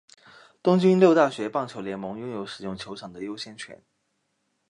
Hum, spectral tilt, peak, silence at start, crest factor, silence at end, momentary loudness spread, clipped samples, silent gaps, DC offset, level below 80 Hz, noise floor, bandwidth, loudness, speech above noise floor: none; -7 dB/octave; -6 dBFS; 0.65 s; 20 dB; 0.95 s; 19 LU; under 0.1%; none; under 0.1%; -68 dBFS; -74 dBFS; 10.5 kHz; -24 LUFS; 50 dB